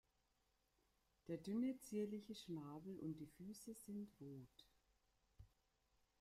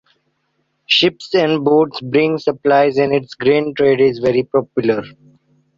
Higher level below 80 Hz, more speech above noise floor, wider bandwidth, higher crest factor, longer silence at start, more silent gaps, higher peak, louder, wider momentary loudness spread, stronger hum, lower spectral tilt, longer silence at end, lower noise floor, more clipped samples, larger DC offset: second, -80 dBFS vs -56 dBFS; second, 34 dB vs 52 dB; first, 15.5 kHz vs 7.4 kHz; about the same, 16 dB vs 14 dB; first, 1.25 s vs 0.9 s; neither; second, -36 dBFS vs -2 dBFS; second, -51 LUFS vs -15 LUFS; first, 13 LU vs 5 LU; neither; about the same, -6.5 dB/octave vs -6 dB/octave; about the same, 0.75 s vs 0.7 s; first, -85 dBFS vs -67 dBFS; neither; neither